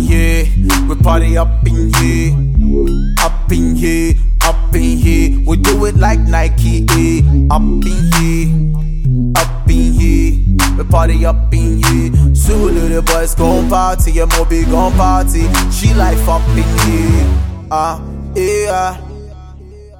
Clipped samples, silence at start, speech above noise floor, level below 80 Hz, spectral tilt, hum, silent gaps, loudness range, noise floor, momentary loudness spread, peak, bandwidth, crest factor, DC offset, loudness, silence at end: under 0.1%; 0 s; 23 dB; -12 dBFS; -5.5 dB/octave; none; none; 2 LU; -33 dBFS; 4 LU; 0 dBFS; 17 kHz; 10 dB; under 0.1%; -13 LUFS; 0.15 s